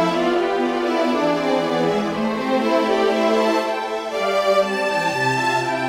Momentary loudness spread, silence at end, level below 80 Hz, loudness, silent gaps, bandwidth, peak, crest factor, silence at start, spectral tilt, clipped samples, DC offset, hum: 4 LU; 0 s; -56 dBFS; -19 LUFS; none; 16.5 kHz; -6 dBFS; 14 dB; 0 s; -5 dB/octave; under 0.1%; under 0.1%; none